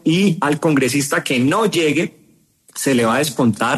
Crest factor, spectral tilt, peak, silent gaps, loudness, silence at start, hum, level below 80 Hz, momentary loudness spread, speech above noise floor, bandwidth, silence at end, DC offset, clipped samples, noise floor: 14 dB; -4.5 dB/octave; -4 dBFS; none; -17 LUFS; 0.05 s; none; -58 dBFS; 5 LU; 38 dB; 13.5 kHz; 0 s; under 0.1%; under 0.1%; -54 dBFS